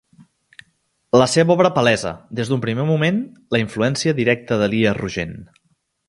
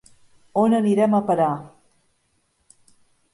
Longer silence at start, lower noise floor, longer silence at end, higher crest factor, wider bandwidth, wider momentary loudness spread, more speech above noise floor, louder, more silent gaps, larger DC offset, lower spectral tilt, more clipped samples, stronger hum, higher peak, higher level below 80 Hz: first, 1.15 s vs 0.55 s; about the same, -66 dBFS vs -68 dBFS; second, 0.65 s vs 1.65 s; about the same, 20 dB vs 16 dB; about the same, 11.5 kHz vs 11.5 kHz; first, 11 LU vs 8 LU; about the same, 48 dB vs 49 dB; about the same, -18 LUFS vs -20 LUFS; neither; neither; second, -5.5 dB/octave vs -8 dB/octave; neither; neither; first, 0 dBFS vs -8 dBFS; first, -50 dBFS vs -66 dBFS